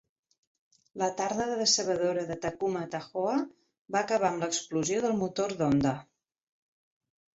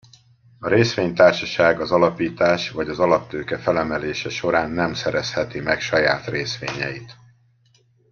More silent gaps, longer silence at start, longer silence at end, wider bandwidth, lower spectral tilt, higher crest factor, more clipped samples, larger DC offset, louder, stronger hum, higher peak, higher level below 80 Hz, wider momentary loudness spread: first, 3.78-3.85 s vs none; first, 0.95 s vs 0.6 s; first, 1.4 s vs 1 s; first, 8.4 kHz vs 7.2 kHz; about the same, -4 dB/octave vs -5 dB/octave; about the same, 18 dB vs 20 dB; neither; neither; second, -29 LUFS vs -20 LUFS; neither; second, -12 dBFS vs -2 dBFS; second, -64 dBFS vs -52 dBFS; about the same, 9 LU vs 10 LU